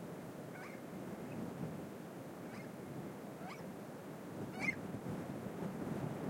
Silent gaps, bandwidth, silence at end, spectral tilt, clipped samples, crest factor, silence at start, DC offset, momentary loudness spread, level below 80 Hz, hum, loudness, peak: none; 16.5 kHz; 0 s; -6.5 dB/octave; under 0.1%; 20 dB; 0 s; under 0.1%; 9 LU; -74 dBFS; none; -46 LUFS; -26 dBFS